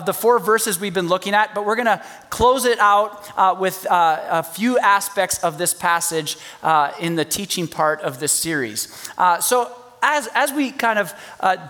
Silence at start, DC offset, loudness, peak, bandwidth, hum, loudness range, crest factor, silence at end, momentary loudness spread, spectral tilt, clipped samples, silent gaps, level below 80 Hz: 0 s; under 0.1%; -19 LUFS; -2 dBFS; 19.5 kHz; none; 3 LU; 18 dB; 0 s; 8 LU; -2.5 dB/octave; under 0.1%; none; -50 dBFS